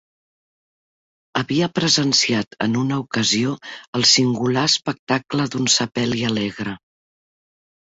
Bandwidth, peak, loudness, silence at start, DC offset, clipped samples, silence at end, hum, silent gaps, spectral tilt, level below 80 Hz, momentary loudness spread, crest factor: 8 kHz; -2 dBFS; -19 LUFS; 1.35 s; under 0.1%; under 0.1%; 1.15 s; none; 2.47-2.51 s, 3.87-3.93 s, 4.99-5.07 s; -3.5 dB/octave; -58 dBFS; 11 LU; 18 dB